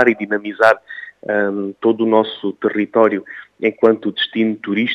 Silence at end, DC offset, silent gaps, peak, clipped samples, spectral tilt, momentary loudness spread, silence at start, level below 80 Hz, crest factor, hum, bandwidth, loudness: 0 s; under 0.1%; none; 0 dBFS; under 0.1%; -6.5 dB/octave; 8 LU; 0 s; -70 dBFS; 16 dB; none; 9 kHz; -17 LUFS